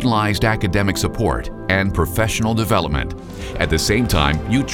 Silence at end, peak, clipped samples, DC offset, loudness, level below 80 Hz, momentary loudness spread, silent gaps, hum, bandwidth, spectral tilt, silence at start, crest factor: 0 s; 0 dBFS; under 0.1%; under 0.1%; -18 LUFS; -28 dBFS; 7 LU; none; none; 17 kHz; -5 dB/octave; 0 s; 18 dB